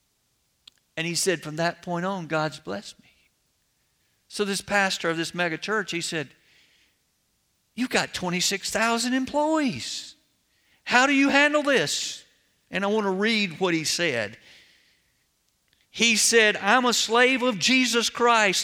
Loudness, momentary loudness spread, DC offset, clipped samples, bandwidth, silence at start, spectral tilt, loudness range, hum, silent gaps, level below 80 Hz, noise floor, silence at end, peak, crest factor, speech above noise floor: -23 LUFS; 15 LU; under 0.1%; under 0.1%; 17.5 kHz; 0.95 s; -2.5 dB/octave; 8 LU; none; none; -64 dBFS; -71 dBFS; 0 s; -4 dBFS; 22 dB; 47 dB